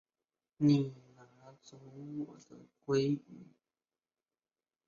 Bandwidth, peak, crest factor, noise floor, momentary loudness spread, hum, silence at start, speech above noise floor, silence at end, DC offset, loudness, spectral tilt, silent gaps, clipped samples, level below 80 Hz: 7.2 kHz; -16 dBFS; 22 dB; under -90 dBFS; 27 LU; none; 0.6 s; over 56 dB; 1.45 s; under 0.1%; -34 LUFS; -7.5 dB/octave; none; under 0.1%; -78 dBFS